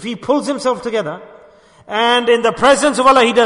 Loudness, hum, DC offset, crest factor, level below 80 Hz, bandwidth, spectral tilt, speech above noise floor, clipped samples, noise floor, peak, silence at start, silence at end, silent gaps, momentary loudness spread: -14 LUFS; none; under 0.1%; 14 dB; -50 dBFS; 11 kHz; -3 dB/octave; 31 dB; under 0.1%; -45 dBFS; 0 dBFS; 0 s; 0 s; none; 11 LU